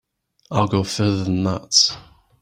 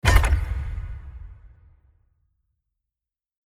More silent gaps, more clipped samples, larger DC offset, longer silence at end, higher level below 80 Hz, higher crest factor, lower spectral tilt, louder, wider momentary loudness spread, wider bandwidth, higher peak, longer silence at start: neither; neither; neither; second, 0.4 s vs 2 s; second, -52 dBFS vs -28 dBFS; about the same, 20 dB vs 24 dB; about the same, -4 dB/octave vs -4.5 dB/octave; first, -19 LUFS vs -25 LUFS; second, 8 LU vs 24 LU; about the same, 15 kHz vs 16 kHz; about the same, -2 dBFS vs -2 dBFS; first, 0.5 s vs 0.05 s